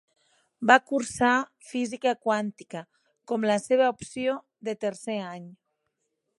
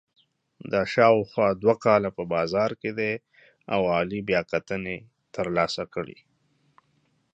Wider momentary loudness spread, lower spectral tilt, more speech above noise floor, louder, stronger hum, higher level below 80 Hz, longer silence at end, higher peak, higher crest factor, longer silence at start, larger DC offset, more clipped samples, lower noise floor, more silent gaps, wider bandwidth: about the same, 16 LU vs 15 LU; second, -4 dB/octave vs -6 dB/octave; first, 53 dB vs 44 dB; about the same, -26 LUFS vs -25 LUFS; neither; second, -68 dBFS vs -58 dBFS; second, 0.85 s vs 1.2 s; about the same, -2 dBFS vs -4 dBFS; about the same, 26 dB vs 22 dB; about the same, 0.6 s vs 0.65 s; neither; neither; first, -79 dBFS vs -69 dBFS; neither; first, 11.5 kHz vs 8.2 kHz